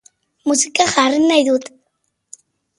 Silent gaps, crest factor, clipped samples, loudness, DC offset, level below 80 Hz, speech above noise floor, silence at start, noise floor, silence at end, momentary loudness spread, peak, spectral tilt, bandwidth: none; 18 dB; under 0.1%; -15 LUFS; under 0.1%; -60 dBFS; 55 dB; 0.45 s; -70 dBFS; 1.1 s; 7 LU; 0 dBFS; -1.5 dB/octave; 11.5 kHz